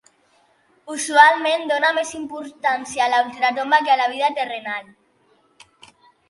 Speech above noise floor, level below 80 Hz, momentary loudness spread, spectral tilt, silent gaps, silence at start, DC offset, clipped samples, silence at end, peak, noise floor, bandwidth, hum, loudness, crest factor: 41 dB; -68 dBFS; 16 LU; -1 dB/octave; none; 0.85 s; under 0.1%; under 0.1%; 1.45 s; 0 dBFS; -60 dBFS; 11.5 kHz; none; -18 LUFS; 20 dB